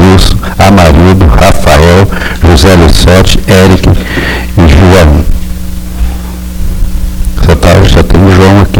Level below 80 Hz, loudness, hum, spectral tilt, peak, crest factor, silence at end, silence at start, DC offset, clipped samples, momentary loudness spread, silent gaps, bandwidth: -10 dBFS; -5 LUFS; none; -6 dB/octave; 0 dBFS; 4 dB; 0 s; 0 s; under 0.1%; 6%; 13 LU; none; 18.5 kHz